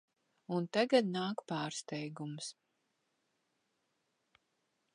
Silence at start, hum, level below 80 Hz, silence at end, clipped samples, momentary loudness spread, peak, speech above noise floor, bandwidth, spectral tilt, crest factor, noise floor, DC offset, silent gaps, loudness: 0.5 s; none; -90 dBFS; 2.45 s; under 0.1%; 13 LU; -16 dBFS; 46 dB; 11 kHz; -5 dB/octave; 24 dB; -82 dBFS; under 0.1%; none; -36 LUFS